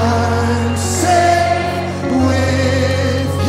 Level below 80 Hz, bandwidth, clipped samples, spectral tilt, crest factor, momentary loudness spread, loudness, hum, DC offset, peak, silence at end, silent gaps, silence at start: -36 dBFS; 15.5 kHz; under 0.1%; -5.5 dB/octave; 12 dB; 5 LU; -15 LUFS; none; under 0.1%; -2 dBFS; 0 s; none; 0 s